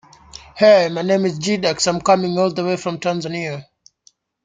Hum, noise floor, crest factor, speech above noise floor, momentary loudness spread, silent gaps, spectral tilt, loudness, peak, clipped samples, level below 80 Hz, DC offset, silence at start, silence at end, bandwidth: none; -57 dBFS; 18 dB; 40 dB; 13 LU; none; -4.5 dB/octave; -17 LUFS; -2 dBFS; under 0.1%; -56 dBFS; under 0.1%; 0.35 s; 0.85 s; 9.6 kHz